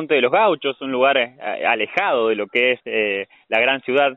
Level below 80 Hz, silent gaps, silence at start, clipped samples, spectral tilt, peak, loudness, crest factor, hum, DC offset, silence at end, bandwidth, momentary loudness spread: -68 dBFS; none; 0 s; under 0.1%; -0.5 dB/octave; -4 dBFS; -19 LUFS; 16 dB; none; under 0.1%; 0 s; 6.2 kHz; 6 LU